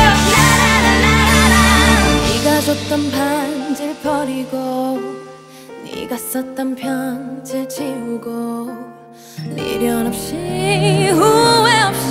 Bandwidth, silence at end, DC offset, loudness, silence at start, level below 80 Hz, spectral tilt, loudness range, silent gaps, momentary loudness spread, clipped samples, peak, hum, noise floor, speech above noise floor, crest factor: 16 kHz; 0 s; under 0.1%; -15 LUFS; 0 s; -28 dBFS; -4 dB/octave; 12 LU; none; 16 LU; under 0.1%; 0 dBFS; none; -38 dBFS; 20 dB; 16 dB